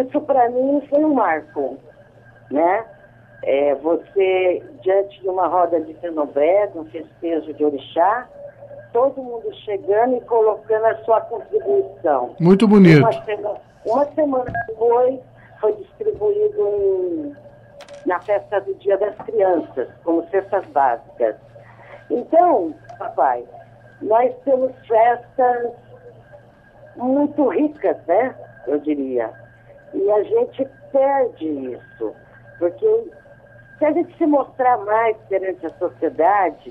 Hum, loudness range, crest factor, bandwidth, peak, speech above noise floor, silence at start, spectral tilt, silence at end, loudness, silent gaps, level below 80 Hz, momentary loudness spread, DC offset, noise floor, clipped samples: none; 6 LU; 16 dB; 9.4 kHz; -2 dBFS; 29 dB; 0 s; -9 dB/octave; 0 s; -19 LUFS; none; -58 dBFS; 12 LU; under 0.1%; -47 dBFS; under 0.1%